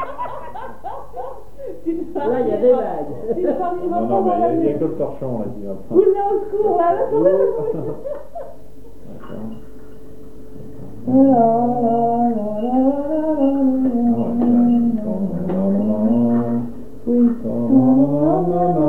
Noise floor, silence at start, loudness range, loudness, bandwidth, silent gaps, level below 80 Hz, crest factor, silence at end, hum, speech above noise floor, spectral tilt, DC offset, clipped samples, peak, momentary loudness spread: -42 dBFS; 0 s; 5 LU; -18 LUFS; 3.6 kHz; none; -46 dBFS; 16 dB; 0 s; none; 25 dB; -10.5 dB/octave; 3%; under 0.1%; -2 dBFS; 18 LU